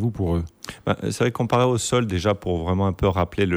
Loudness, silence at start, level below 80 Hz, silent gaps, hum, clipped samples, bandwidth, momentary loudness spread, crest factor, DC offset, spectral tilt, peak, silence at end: -23 LUFS; 0 s; -40 dBFS; none; none; under 0.1%; over 20 kHz; 7 LU; 14 dB; under 0.1%; -6 dB/octave; -8 dBFS; 0 s